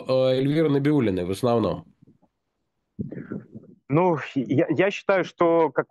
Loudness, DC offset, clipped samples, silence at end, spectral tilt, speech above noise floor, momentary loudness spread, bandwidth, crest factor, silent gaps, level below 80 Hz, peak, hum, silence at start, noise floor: -22 LUFS; under 0.1%; under 0.1%; 0.1 s; -7.5 dB/octave; 56 dB; 15 LU; 12.5 kHz; 16 dB; none; -60 dBFS; -6 dBFS; none; 0 s; -78 dBFS